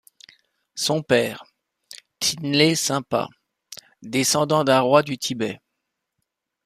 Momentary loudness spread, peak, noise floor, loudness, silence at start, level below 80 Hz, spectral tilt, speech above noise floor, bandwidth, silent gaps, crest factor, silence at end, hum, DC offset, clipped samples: 22 LU; -2 dBFS; -80 dBFS; -21 LUFS; 0.75 s; -64 dBFS; -3.5 dB/octave; 59 dB; 15.5 kHz; none; 22 dB; 1.1 s; none; under 0.1%; under 0.1%